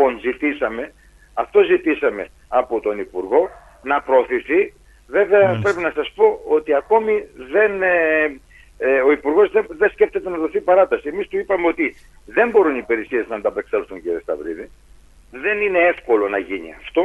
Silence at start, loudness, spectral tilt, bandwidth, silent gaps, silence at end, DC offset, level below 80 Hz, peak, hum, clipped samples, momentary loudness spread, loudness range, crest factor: 0 s; -19 LUFS; -6.5 dB/octave; 7.6 kHz; none; 0 s; under 0.1%; -50 dBFS; -2 dBFS; none; under 0.1%; 11 LU; 4 LU; 16 dB